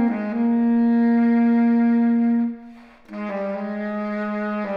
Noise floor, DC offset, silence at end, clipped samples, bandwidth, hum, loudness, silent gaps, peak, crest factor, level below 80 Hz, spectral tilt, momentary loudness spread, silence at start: -43 dBFS; under 0.1%; 0 s; under 0.1%; 4.8 kHz; none; -20 LUFS; none; -12 dBFS; 10 dB; -64 dBFS; -9.5 dB/octave; 10 LU; 0 s